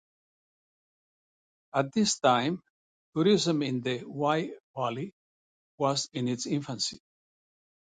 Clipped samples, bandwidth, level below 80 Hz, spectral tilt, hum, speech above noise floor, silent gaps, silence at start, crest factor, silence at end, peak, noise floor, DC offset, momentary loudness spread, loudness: under 0.1%; 9.6 kHz; -72 dBFS; -4.5 dB/octave; none; over 62 dB; 2.70-3.13 s, 4.60-4.74 s, 5.13-5.78 s; 1.75 s; 22 dB; 0.85 s; -10 dBFS; under -90 dBFS; under 0.1%; 10 LU; -29 LUFS